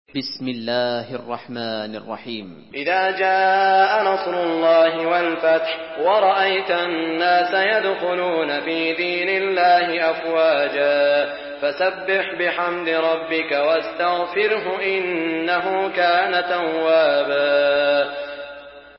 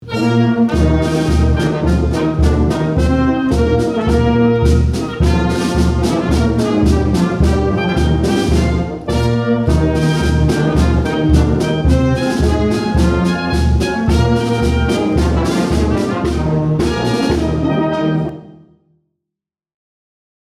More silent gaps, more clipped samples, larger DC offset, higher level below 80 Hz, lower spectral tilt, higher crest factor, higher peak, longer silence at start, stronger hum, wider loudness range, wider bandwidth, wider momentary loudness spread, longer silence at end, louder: neither; neither; neither; second, -64 dBFS vs -22 dBFS; about the same, -8 dB/octave vs -7 dB/octave; about the same, 14 dB vs 14 dB; second, -6 dBFS vs 0 dBFS; first, 0.15 s vs 0 s; neither; about the same, 3 LU vs 3 LU; second, 5.8 kHz vs 12.5 kHz; first, 11 LU vs 3 LU; second, 0.15 s vs 2.05 s; second, -19 LUFS vs -15 LUFS